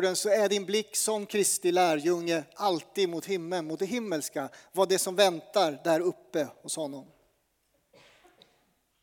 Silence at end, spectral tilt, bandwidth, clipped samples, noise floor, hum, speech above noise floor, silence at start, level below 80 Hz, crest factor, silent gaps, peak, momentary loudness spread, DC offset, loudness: 2 s; -3 dB/octave; over 20 kHz; under 0.1%; -73 dBFS; none; 45 dB; 0 s; -82 dBFS; 22 dB; none; -8 dBFS; 9 LU; under 0.1%; -28 LUFS